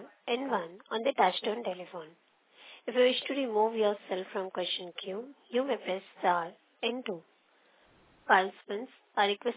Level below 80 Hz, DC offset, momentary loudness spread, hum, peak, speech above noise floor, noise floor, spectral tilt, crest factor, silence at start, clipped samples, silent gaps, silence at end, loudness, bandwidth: -88 dBFS; under 0.1%; 15 LU; none; -10 dBFS; 34 dB; -66 dBFS; -1 dB/octave; 22 dB; 0 s; under 0.1%; none; 0 s; -32 LUFS; 4 kHz